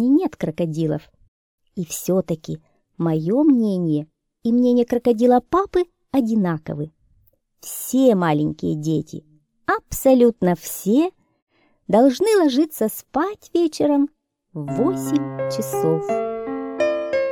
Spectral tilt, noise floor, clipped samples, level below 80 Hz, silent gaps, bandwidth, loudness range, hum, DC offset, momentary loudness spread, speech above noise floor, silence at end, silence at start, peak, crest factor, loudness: -6.5 dB/octave; -60 dBFS; under 0.1%; -52 dBFS; 1.28-1.58 s, 11.42-11.47 s; 18 kHz; 4 LU; none; under 0.1%; 13 LU; 41 dB; 0 s; 0 s; -4 dBFS; 16 dB; -20 LUFS